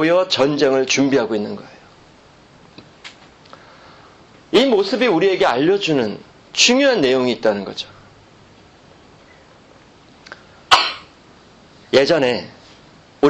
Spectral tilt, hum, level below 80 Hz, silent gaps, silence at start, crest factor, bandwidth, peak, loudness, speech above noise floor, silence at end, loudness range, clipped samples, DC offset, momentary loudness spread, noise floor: -3.5 dB/octave; none; -56 dBFS; none; 0 s; 20 dB; 11.5 kHz; 0 dBFS; -16 LUFS; 31 dB; 0 s; 10 LU; under 0.1%; under 0.1%; 20 LU; -47 dBFS